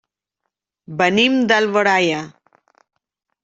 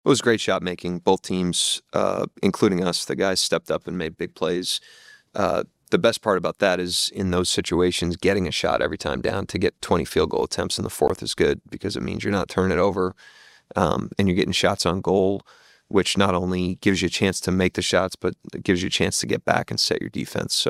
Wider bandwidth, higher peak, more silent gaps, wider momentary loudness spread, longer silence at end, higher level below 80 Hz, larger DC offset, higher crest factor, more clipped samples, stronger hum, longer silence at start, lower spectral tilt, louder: second, 7.8 kHz vs 15.5 kHz; about the same, -2 dBFS vs 0 dBFS; neither; first, 14 LU vs 7 LU; first, 1.15 s vs 0 s; second, -64 dBFS vs -52 dBFS; neither; about the same, 18 dB vs 22 dB; neither; neither; first, 0.9 s vs 0.05 s; about the same, -4.5 dB/octave vs -4 dB/octave; first, -16 LUFS vs -23 LUFS